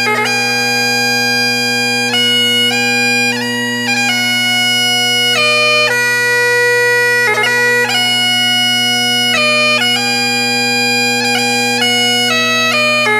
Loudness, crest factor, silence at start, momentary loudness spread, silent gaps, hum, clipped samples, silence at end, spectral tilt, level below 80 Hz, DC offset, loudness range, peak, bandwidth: -10 LUFS; 12 dB; 0 s; 3 LU; none; none; under 0.1%; 0 s; -1.5 dB/octave; -62 dBFS; under 0.1%; 1 LU; 0 dBFS; 16 kHz